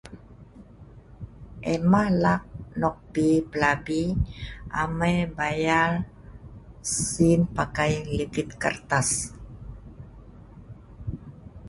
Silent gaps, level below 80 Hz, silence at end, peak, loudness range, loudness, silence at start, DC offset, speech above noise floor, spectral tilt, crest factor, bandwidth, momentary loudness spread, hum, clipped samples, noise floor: none; -42 dBFS; 0 s; -6 dBFS; 4 LU; -25 LUFS; 0.05 s; under 0.1%; 24 dB; -5 dB/octave; 20 dB; 11.5 kHz; 23 LU; none; under 0.1%; -48 dBFS